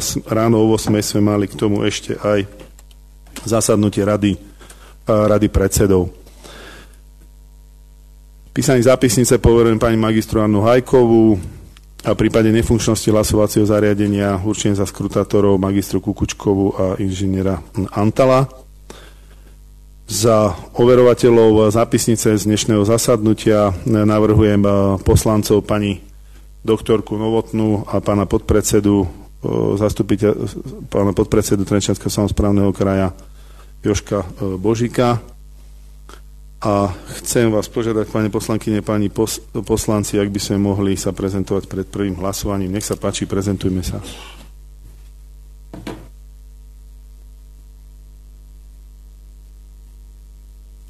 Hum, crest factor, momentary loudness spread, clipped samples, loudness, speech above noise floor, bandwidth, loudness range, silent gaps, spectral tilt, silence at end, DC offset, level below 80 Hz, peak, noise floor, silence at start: 50 Hz at -40 dBFS; 14 dB; 10 LU; under 0.1%; -16 LUFS; 26 dB; 13.5 kHz; 7 LU; none; -6 dB/octave; 0 s; under 0.1%; -34 dBFS; -2 dBFS; -42 dBFS; 0 s